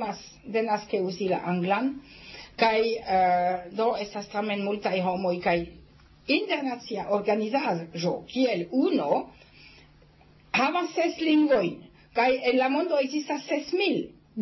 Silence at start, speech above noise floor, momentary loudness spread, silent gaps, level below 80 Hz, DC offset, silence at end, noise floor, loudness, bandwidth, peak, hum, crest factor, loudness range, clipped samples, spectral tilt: 0 s; 30 dB; 9 LU; none; -60 dBFS; under 0.1%; 0 s; -56 dBFS; -26 LUFS; 6.2 kHz; -8 dBFS; none; 18 dB; 3 LU; under 0.1%; -5.5 dB/octave